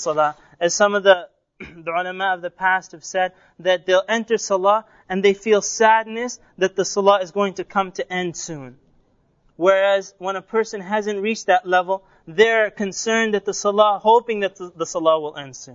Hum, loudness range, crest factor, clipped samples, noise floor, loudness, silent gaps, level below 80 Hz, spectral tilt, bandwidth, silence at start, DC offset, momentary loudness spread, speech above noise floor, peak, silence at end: none; 4 LU; 20 dB; under 0.1%; -60 dBFS; -20 LUFS; none; -62 dBFS; -3 dB/octave; 7.6 kHz; 0 s; under 0.1%; 11 LU; 41 dB; 0 dBFS; 0 s